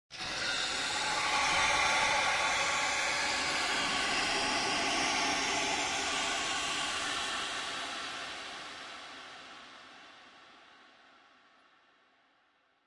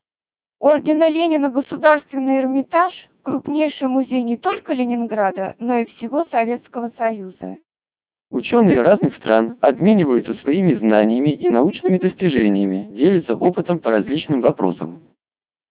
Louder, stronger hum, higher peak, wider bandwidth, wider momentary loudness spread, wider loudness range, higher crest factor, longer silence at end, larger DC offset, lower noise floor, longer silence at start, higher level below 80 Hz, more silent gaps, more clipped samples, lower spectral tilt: second, -30 LUFS vs -18 LUFS; neither; second, -16 dBFS vs 0 dBFS; first, 12 kHz vs 4 kHz; first, 17 LU vs 8 LU; first, 16 LU vs 5 LU; about the same, 18 dB vs 18 dB; first, 2.2 s vs 0.75 s; neither; second, -71 dBFS vs under -90 dBFS; second, 0.1 s vs 0.6 s; about the same, -62 dBFS vs -58 dBFS; neither; neither; second, -0.5 dB/octave vs -11 dB/octave